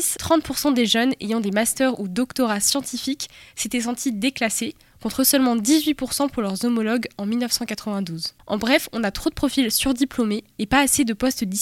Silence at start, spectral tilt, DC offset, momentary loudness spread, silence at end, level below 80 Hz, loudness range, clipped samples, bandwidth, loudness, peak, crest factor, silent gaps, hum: 0 s; -3 dB/octave; under 0.1%; 9 LU; 0 s; -46 dBFS; 2 LU; under 0.1%; 17 kHz; -21 LUFS; -2 dBFS; 20 dB; none; none